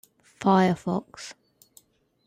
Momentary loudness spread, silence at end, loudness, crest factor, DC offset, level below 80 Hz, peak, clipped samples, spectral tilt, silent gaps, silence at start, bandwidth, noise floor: 20 LU; 0.95 s; -24 LUFS; 18 dB; under 0.1%; -66 dBFS; -8 dBFS; under 0.1%; -6.5 dB/octave; none; 0.4 s; 15 kHz; -60 dBFS